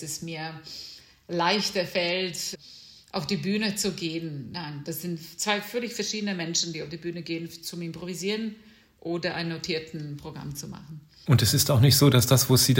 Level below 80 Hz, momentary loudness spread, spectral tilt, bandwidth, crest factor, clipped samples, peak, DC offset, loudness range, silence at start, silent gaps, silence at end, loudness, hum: -58 dBFS; 18 LU; -4 dB/octave; 16.5 kHz; 20 dB; under 0.1%; -6 dBFS; under 0.1%; 9 LU; 0 s; none; 0 s; -26 LUFS; none